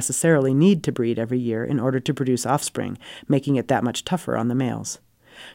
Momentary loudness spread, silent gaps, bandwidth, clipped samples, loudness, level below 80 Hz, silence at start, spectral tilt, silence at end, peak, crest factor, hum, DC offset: 12 LU; none; 16.5 kHz; under 0.1%; -22 LUFS; -60 dBFS; 0 s; -5.5 dB/octave; 0 s; -6 dBFS; 16 dB; none; under 0.1%